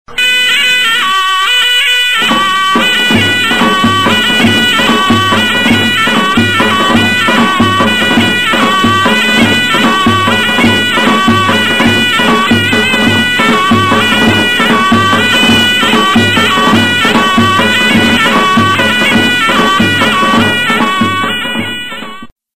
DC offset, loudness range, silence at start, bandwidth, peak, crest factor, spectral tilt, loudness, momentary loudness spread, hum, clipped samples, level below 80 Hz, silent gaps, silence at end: 3%; 1 LU; 0.05 s; 15.5 kHz; 0 dBFS; 8 dB; -3.5 dB/octave; -7 LUFS; 2 LU; none; under 0.1%; -38 dBFS; 22.32-22.36 s; 0 s